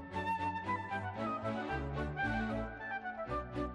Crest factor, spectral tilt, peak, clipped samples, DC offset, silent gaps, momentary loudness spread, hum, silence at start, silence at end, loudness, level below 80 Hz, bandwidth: 14 dB; -7 dB/octave; -24 dBFS; under 0.1%; under 0.1%; none; 5 LU; none; 0 s; 0 s; -38 LUFS; -50 dBFS; 11.5 kHz